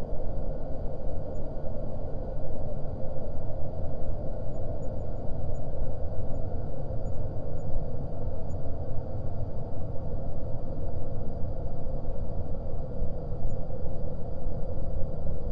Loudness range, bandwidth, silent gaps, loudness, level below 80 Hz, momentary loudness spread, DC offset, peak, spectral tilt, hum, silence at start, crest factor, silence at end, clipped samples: 1 LU; 1.6 kHz; none; -37 LUFS; -34 dBFS; 1 LU; under 0.1%; -12 dBFS; -10.5 dB/octave; none; 0 s; 12 dB; 0 s; under 0.1%